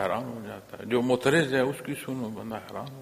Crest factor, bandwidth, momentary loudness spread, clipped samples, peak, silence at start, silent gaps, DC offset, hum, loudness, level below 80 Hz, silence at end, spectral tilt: 22 dB; 15.5 kHz; 16 LU; under 0.1%; -6 dBFS; 0 s; none; under 0.1%; none; -28 LUFS; -64 dBFS; 0 s; -5.5 dB/octave